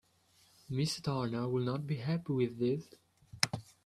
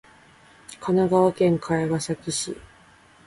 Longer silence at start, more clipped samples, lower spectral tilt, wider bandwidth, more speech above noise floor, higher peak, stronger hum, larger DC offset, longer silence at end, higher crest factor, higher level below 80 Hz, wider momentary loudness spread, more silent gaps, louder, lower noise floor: about the same, 0.7 s vs 0.7 s; neither; about the same, -5.5 dB/octave vs -5.5 dB/octave; first, 13.5 kHz vs 11.5 kHz; about the same, 34 dB vs 31 dB; about the same, -6 dBFS vs -8 dBFS; neither; neither; second, 0.25 s vs 0.65 s; first, 30 dB vs 16 dB; second, -68 dBFS vs -56 dBFS; second, 3 LU vs 15 LU; neither; second, -35 LUFS vs -23 LUFS; first, -68 dBFS vs -53 dBFS